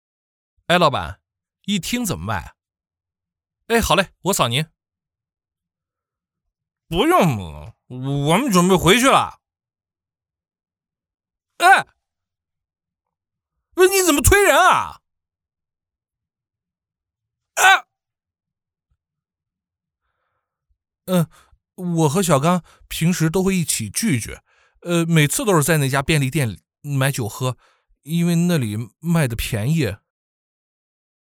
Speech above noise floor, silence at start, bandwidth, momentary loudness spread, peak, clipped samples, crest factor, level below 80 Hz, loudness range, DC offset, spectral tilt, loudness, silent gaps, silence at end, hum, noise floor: over 72 dB; 0.7 s; 19.5 kHz; 15 LU; -2 dBFS; under 0.1%; 20 dB; -40 dBFS; 6 LU; under 0.1%; -4.5 dB/octave; -18 LUFS; none; 1.35 s; none; under -90 dBFS